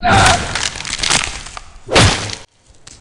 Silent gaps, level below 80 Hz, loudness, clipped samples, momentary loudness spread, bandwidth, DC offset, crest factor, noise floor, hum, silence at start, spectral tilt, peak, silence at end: none; -28 dBFS; -14 LUFS; under 0.1%; 19 LU; 17.5 kHz; under 0.1%; 16 dB; -42 dBFS; none; 0 s; -3 dB/octave; 0 dBFS; 0.05 s